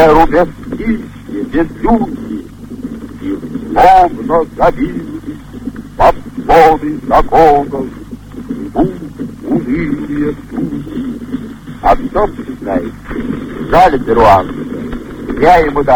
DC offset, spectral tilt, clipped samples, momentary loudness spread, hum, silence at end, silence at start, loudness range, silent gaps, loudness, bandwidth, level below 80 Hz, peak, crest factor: 0.4%; -7 dB/octave; 0.4%; 17 LU; none; 0 s; 0 s; 7 LU; none; -12 LUFS; 17 kHz; -26 dBFS; 0 dBFS; 12 dB